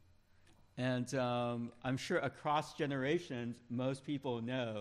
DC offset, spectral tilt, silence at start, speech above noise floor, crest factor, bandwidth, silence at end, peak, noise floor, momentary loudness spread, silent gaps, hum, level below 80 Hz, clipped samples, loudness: under 0.1%; -6 dB/octave; 0.75 s; 28 dB; 16 dB; 13.5 kHz; 0 s; -22 dBFS; -66 dBFS; 5 LU; none; none; -72 dBFS; under 0.1%; -38 LUFS